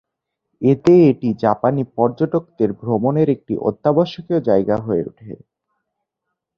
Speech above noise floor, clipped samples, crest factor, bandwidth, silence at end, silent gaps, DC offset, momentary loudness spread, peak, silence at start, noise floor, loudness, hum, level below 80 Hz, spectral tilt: 62 dB; under 0.1%; 16 dB; 7 kHz; 1.2 s; none; under 0.1%; 10 LU; -2 dBFS; 0.6 s; -79 dBFS; -17 LUFS; none; -54 dBFS; -9.5 dB/octave